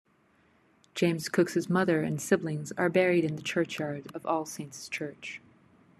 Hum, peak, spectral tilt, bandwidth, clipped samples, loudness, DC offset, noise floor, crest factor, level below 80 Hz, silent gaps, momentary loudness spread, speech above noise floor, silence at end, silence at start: none; -10 dBFS; -5.5 dB/octave; 13.5 kHz; under 0.1%; -29 LUFS; under 0.1%; -66 dBFS; 20 dB; -72 dBFS; none; 13 LU; 37 dB; 0.65 s; 0.95 s